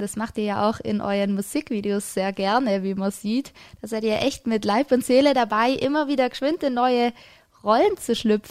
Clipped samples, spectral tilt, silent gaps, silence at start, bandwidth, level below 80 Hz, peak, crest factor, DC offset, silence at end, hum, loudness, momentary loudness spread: under 0.1%; -5 dB/octave; none; 0 s; 15.5 kHz; -56 dBFS; -6 dBFS; 16 dB; under 0.1%; 0 s; none; -23 LUFS; 7 LU